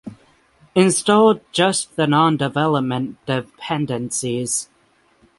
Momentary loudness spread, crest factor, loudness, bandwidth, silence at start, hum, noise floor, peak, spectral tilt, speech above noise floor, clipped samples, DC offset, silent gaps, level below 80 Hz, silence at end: 10 LU; 18 dB; -19 LUFS; 12 kHz; 0.05 s; none; -58 dBFS; -2 dBFS; -4.5 dB/octave; 40 dB; under 0.1%; under 0.1%; none; -60 dBFS; 0.75 s